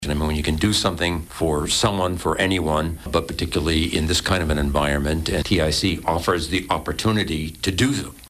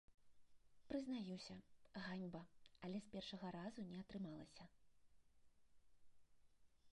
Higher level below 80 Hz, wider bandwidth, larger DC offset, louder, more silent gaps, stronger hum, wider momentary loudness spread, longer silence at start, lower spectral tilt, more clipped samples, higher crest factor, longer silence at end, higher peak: first, -32 dBFS vs -78 dBFS; first, 15.5 kHz vs 11 kHz; neither; first, -21 LUFS vs -53 LUFS; neither; neither; second, 5 LU vs 13 LU; about the same, 0 s vs 0.1 s; second, -4.5 dB/octave vs -6 dB/octave; neither; second, 14 dB vs 20 dB; about the same, 0 s vs 0 s; first, -8 dBFS vs -36 dBFS